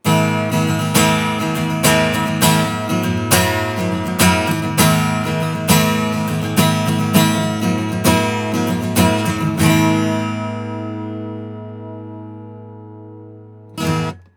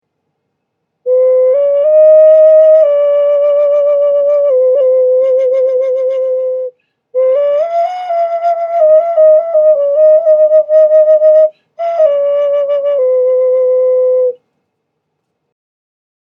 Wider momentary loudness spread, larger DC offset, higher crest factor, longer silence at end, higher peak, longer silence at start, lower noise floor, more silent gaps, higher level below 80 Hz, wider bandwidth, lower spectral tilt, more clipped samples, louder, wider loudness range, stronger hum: first, 18 LU vs 9 LU; neither; first, 18 dB vs 10 dB; second, 0.15 s vs 2.05 s; about the same, 0 dBFS vs 0 dBFS; second, 0.05 s vs 1.05 s; second, -38 dBFS vs -70 dBFS; neither; first, -44 dBFS vs -76 dBFS; first, over 20 kHz vs 5 kHz; about the same, -4.5 dB/octave vs -4 dB/octave; neither; second, -16 LUFS vs -10 LUFS; first, 11 LU vs 6 LU; neither